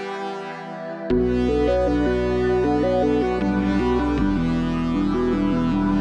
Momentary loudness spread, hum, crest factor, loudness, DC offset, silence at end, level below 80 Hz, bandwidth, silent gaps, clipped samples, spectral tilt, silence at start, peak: 10 LU; none; 12 dB; -21 LUFS; under 0.1%; 0 s; -32 dBFS; 9.2 kHz; none; under 0.1%; -8 dB/octave; 0 s; -10 dBFS